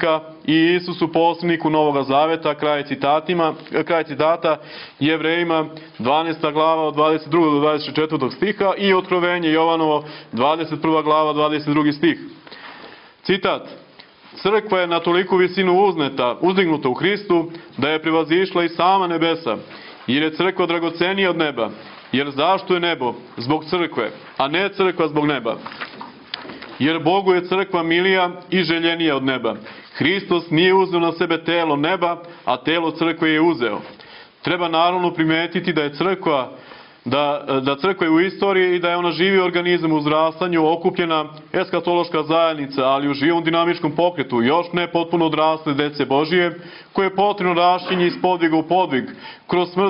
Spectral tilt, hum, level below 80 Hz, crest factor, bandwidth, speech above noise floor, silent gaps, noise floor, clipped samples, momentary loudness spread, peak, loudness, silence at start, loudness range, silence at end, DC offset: -10 dB/octave; none; -62 dBFS; 18 dB; 5.6 kHz; 27 dB; none; -46 dBFS; under 0.1%; 9 LU; 0 dBFS; -19 LUFS; 0 s; 3 LU; 0 s; under 0.1%